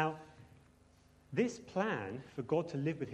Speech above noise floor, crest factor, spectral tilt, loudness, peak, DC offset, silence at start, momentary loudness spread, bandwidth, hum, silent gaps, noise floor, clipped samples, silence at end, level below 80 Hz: 29 dB; 20 dB; -6.5 dB/octave; -38 LUFS; -18 dBFS; under 0.1%; 0 s; 9 LU; 11 kHz; none; none; -65 dBFS; under 0.1%; 0 s; -70 dBFS